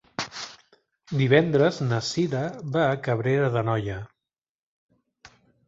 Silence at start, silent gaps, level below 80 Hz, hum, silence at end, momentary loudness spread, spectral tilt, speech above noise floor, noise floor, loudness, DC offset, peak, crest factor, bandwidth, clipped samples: 0.2 s; 4.38-4.42 s, 4.49-4.89 s; -56 dBFS; none; 0.4 s; 15 LU; -6 dB/octave; 64 dB; -87 dBFS; -24 LUFS; under 0.1%; -4 dBFS; 22 dB; 8 kHz; under 0.1%